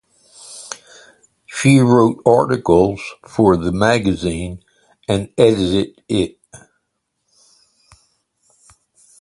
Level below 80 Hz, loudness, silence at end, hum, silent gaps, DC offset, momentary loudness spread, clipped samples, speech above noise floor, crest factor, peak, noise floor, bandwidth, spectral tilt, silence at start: -42 dBFS; -16 LUFS; 2.65 s; none; none; under 0.1%; 19 LU; under 0.1%; 58 dB; 18 dB; 0 dBFS; -73 dBFS; 11.5 kHz; -6 dB/octave; 0.5 s